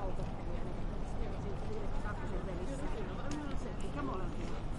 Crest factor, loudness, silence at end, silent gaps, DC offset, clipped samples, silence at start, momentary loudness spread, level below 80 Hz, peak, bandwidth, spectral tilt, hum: 12 dB; -42 LUFS; 0 s; none; under 0.1%; under 0.1%; 0 s; 2 LU; -40 dBFS; -24 dBFS; 11 kHz; -7 dB/octave; none